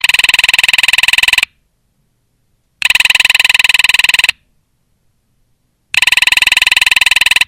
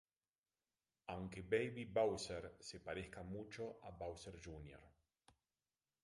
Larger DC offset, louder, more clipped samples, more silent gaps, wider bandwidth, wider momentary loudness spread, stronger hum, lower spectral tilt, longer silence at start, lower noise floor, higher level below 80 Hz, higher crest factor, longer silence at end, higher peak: neither; first, -8 LUFS vs -46 LUFS; first, 0.5% vs under 0.1%; neither; first, over 20 kHz vs 11.5 kHz; second, 5 LU vs 15 LU; neither; second, 2.5 dB/octave vs -5 dB/octave; second, 0.05 s vs 1.1 s; second, -60 dBFS vs under -90 dBFS; first, -42 dBFS vs -68 dBFS; second, 12 dB vs 22 dB; second, 0.05 s vs 1.15 s; first, 0 dBFS vs -24 dBFS